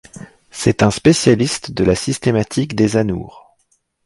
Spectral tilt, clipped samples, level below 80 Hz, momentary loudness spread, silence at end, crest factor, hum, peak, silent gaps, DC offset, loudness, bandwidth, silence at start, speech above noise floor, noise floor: -5.5 dB/octave; under 0.1%; -40 dBFS; 9 LU; 0.65 s; 16 dB; none; 0 dBFS; none; under 0.1%; -16 LUFS; 11.5 kHz; 0.15 s; 48 dB; -63 dBFS